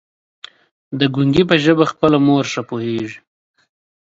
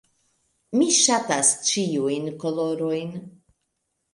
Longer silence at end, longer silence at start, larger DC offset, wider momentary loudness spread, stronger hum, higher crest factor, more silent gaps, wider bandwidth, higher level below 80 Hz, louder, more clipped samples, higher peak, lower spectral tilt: about the same, 0.9 s vs 0.85 s; first, 0.9 s vs 0.7 s; neither; about the same, 11 LU vs 11 LU; neither; about the same, 18 dB vs 20 dB; neither; second, 7.8 kHz vs 11.5 kHz; first, -50 dBFS vs -72 dBFS; first, -16 LUFS vs -21 LUFS; neither; first, 0 dBFS vs -4 dBFS; first, -6 dB/octave vs -2.5 dB/octave